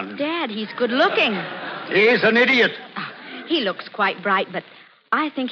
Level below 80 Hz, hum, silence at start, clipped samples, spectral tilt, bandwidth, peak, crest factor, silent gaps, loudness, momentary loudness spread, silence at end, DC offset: -76 dBFS; none; 0 s; under 0.1%; -5.5 dB/octave; 7 kHz; -4 dBFS; 16 dB; none; -19 LUFS; 16 LU; 0 s; under 0.1%